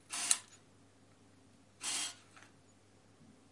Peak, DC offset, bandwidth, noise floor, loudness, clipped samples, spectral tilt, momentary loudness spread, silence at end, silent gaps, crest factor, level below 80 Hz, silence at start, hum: -6 dBFS; under 0.1%; 11.5 kHz; -65 dBFS; -36 LUFS; under 0.1%; 1 dB/octave; 27 LU; 0.2 s; none; 38 dB; -86 dBFS; 0.1 s; none